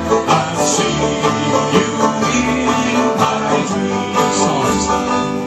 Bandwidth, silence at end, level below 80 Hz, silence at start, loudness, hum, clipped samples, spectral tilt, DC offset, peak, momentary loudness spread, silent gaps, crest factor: 13 kHz; 0 s; -40 dBFS; 0 s; -15 LUFS; none; under 0.1%; -4 dB/octave; under 0.1%; 0 dBFS; 2 LU; none; 16 dB